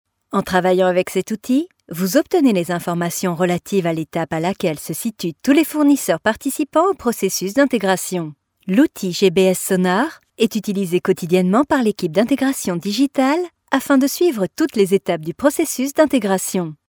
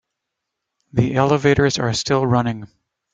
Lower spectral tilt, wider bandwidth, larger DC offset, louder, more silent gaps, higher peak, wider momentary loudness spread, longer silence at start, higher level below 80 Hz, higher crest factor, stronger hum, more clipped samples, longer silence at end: about the same, -5 dB/octave vs -5.5 dB/octave; first, over 20 kHz vs 9.4 kHz; neither; about the same, -18 LUFS vs -18 LUFS; neither; about the same, 0 dBFS vs 0 dBFS; about the same, 7 LU vs 9 LU; second, 0.3 s vs 0.95 s; second, -56 dBFS vs -46 dBFS; about the same, 16 dB vs 20 dB; neither; neither; second, 0.15 s vs 0.5 s